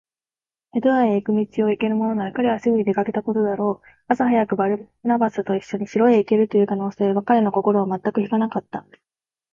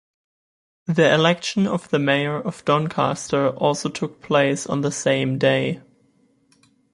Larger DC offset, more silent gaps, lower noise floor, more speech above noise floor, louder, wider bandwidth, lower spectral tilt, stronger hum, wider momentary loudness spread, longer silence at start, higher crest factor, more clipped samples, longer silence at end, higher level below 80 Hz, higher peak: neither; neither; first, under -90 dBFS vs -61 dBFS; first, over 70 dB vs 41 dB; about the same, -21 LUFS vs -21 LUFS; second, 7 kHz vs 11.5 kHz; first, -8.5 dB/octave vs -5 dB/octave; neither; about the same, 7 LU vs 8 LU; second, 0.75 s vs 0.9 s; about the same, 16 dB vs 20 dB; neither; second, 0.75 s vs 1.15 s; about the same, -64 dBFS vs -60 dBFS; about the same, -4 dBFS vs -2 dBFS